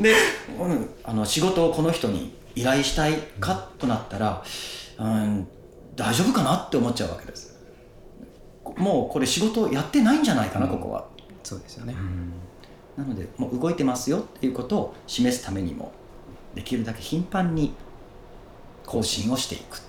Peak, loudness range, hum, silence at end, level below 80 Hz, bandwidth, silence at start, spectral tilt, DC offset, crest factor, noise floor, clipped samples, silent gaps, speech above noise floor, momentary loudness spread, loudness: -6 dBFS; 6 LU; none; 0 s; -46 dBFS; 18.5 kHz; 0 s; -4.5 dB/octave; under 0.1%; 20 dB; -47 dBFS; under 0.1%; none; 23 dB; 17 LU; -25 LUFS